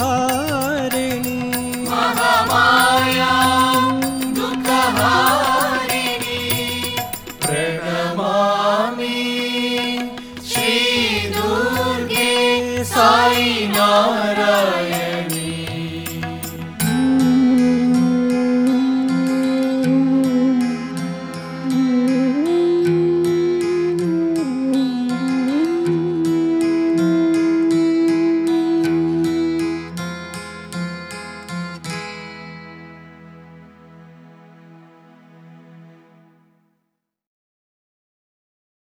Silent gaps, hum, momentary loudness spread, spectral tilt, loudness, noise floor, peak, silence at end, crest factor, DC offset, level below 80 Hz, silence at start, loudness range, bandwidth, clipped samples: none; none; 13 LU; -4.5 dB/octave; -17 LUFS; -75 dBFS; -2 dBFS; 3.05 s; 16 dB; under 0.1%; -52 dBFS; 0 s; 8 LU; over 20 kHz; under 0.1%